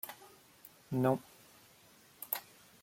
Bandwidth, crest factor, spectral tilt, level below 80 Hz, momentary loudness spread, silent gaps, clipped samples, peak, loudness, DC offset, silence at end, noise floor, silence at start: 16.5 kHz; 24 dB; -6.5 dB/octave; -78 dBFS; 26 LU; none; under 0.1%; -16 dBFS; -37 LUFS; under 0.1%; 0.4 s; -63 dBFS; 0.05 s